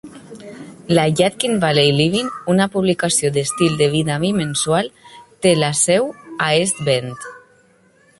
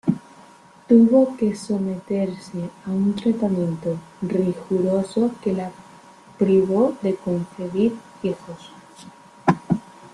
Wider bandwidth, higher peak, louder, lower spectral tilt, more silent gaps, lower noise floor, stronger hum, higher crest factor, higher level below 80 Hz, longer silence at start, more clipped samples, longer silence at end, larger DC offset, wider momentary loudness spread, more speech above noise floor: about the same, 12 kHz vs 11.5 kHz; about the same, -2 dBFS vs -2 dBFS; first, -17 LUFS vs -22 LUFS; second, -4 dB/octave vs -8 dB/octave; neither; first, -54 dBFS vs -48 dBFS; neither; about the same, 16 dB vs 20 dB; first, -54 dBFS vs -60 dBFS; about the same, 0.05 s vs 0.05 s; neither; first, 0.8 s vs 0.05 s; neither; first, 19 LU vs 12 LU; first, 37 dB vs 28 dB